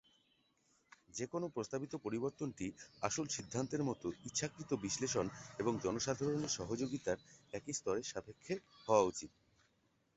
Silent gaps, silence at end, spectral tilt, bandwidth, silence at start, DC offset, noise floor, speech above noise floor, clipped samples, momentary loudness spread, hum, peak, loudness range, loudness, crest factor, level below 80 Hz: none; 0.9 s; -5 dB/octave; 8 kHz; 1.15 s; under 0.1%; -78 dBFS; 38 dB; under 0.1%; 9 LU; none; -16 dBFS; 3 LU; -40 LUFS; 24 dB; -68 dBFS